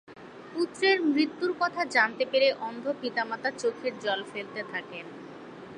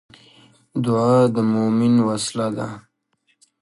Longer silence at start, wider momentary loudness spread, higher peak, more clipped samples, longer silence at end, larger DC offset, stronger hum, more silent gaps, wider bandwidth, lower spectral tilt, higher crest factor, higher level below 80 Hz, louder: second, 0.1 s vs 0.75 s; first, 18 LU vs 14 LU; second, -10 dBFS vs -4 dBFS; neither; second, 0 s vs 0.8 s; neither; neither; neither; about the same, 10.5 kHz vs 11.5 kHz; second, -3.5 dB/octave vs -6.5 dB/octave; about the same, 20 dB vs 16 dB; second, -76 dBFS vs -60 dBFS; second, -28 LUFS vs -19 LUFS